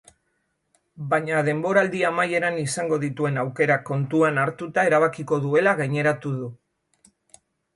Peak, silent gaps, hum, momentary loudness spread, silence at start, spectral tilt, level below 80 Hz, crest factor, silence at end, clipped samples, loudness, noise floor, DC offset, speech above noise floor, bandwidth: -6 dBFS; none; none; 6 LU; 0.95 s; -6 dB/octave; -66 dBFS; 18 dB; 1.2 s; under 0.1%; -22 LUFS; -73 dBFS; under 0.1%; 51 dB; 11.5 kHz